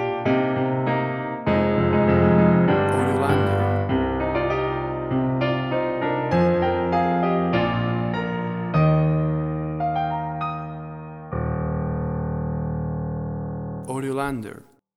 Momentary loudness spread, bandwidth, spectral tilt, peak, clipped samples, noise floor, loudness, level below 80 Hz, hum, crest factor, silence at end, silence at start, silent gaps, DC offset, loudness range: 10 LU; 12 kHz; -8.5 dB/octave; -6 dBFS; under 0.1%; -42 dBFS; -23 LUFS; -40 dBFS; none; 16 dB; 0.4 s; 0 s; none; under 0.1%; 8 LU